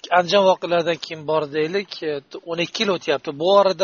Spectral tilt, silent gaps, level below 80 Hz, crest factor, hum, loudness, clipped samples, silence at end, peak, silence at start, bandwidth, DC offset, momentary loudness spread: -2.5 dB/octave; none; -68 dBFS; 18 dB; none; -20 LUFS; under 0.1%; 0 s; -2 dBFS; 0.05 s; 7.2 kHz; under 0.1%; 11 LU